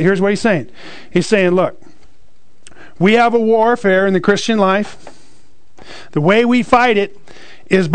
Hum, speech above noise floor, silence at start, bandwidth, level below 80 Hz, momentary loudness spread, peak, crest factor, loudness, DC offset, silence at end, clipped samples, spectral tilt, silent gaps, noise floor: none; 41 dB; 0 s; 9.4 kHz; -48 dBFS; 9 LU; 0 dBFS; 14 dB; -14 LUFS; 3%; 0 s; under 0.1%; -6 dB/octave; none; -55 dBFS